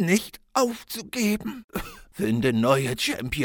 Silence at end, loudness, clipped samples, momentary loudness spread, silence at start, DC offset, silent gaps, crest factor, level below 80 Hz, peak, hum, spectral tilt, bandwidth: 0 s; -25 LUFS; under 0.1%; 13 LU; 0 s; under 0.1%; 1.64-1.69 s; 20 dB; -48 dBFS; -6 dBFS; none; -4.5 dB/octave; 19.5 kHz